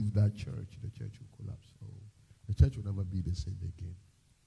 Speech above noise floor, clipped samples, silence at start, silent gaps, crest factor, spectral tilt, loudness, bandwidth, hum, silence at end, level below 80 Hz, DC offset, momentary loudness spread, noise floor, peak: 22 dB; under 0.1%; 0 s; none; 22 dB; -8 dB/octave; -35 LUFS; 10.5 kHz; none; 0.45 s; -44 dBFS; under 0.1%; 21 LU; -55 dBFS; -12 dBFS